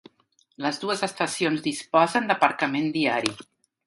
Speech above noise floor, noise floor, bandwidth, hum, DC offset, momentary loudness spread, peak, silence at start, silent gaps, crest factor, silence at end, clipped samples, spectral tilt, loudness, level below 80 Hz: 41 dB; -65 dBFS; 11.5 kHz; none; under 0.1%; 8 LU; -4 dBFS; 0.6 s; none; 22 dB; 0.45 s; under 0.1%; -4 dB/octave; -24 LUFS; -72 dBFS